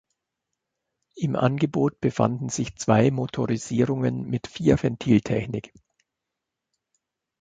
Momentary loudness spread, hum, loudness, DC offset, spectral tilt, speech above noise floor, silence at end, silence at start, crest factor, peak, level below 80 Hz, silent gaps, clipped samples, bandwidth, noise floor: 9 LU; none; -24 LUFS; under 0.1%; -6.5 dB/octave; 61 dB; 1.75 s; 1.15 s; 22 dB; -4 dBFS; -50 dBFS; none; under 0.1%; 9.2 kHz; -85 dBFS